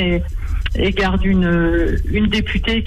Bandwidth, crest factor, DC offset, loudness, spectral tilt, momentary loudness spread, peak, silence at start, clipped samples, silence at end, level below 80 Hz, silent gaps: 10.5 kHz; 10 dB; under 0.1%; -18 LUFS; -7 dB/octave; 7 LU; -6 dBFS; 0 s; under 0.1%; 0 s; -22 dBFS; none